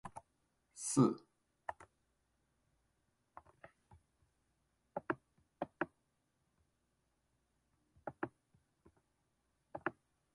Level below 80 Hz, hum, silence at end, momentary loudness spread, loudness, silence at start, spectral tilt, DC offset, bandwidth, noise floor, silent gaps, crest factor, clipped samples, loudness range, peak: -78 dBFS; none; 0.45 s; 27 LU; -41 LUFS; 0.05 s; -5.5 dB/octave; under 0.1%; 11 kHz; -82 dBFS; none; 28 dB; under 0.1%; 17 LU; -16 dBFS